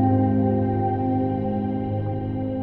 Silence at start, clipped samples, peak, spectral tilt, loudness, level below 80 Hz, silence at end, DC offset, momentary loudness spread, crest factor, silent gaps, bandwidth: 0 s; under 0.1%; -8 dBFS; -12.5 dB/octave; -23 LUFS; -44 dBFS; 0 s; under 0.1%; 7 LU; 14 dB; none; 4.1 kHz